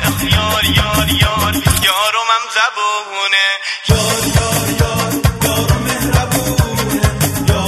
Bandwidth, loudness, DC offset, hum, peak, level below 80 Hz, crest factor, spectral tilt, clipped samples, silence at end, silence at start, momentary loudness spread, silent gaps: 13.5 kHz; -14 LUFS; under 0.1%; none; 0 dBFS; -24 dBFS; 14 dB; -3.5 dB/octave; under 0.1%; 0 s; 0 s; 4 LU; none